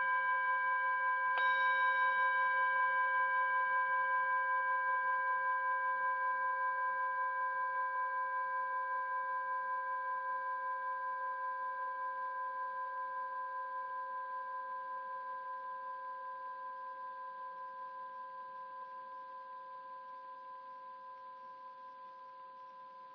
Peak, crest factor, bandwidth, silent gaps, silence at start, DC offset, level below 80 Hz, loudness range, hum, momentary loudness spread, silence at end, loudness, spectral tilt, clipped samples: -22 dBFS; 14 dB; 5.4 kHz; none; 0 s; under 0.1%; under -90 dBFS; 17 LU; none; 18 LU; 0 s; -36 LUFS; -2.5 dB/octave; under 0.1%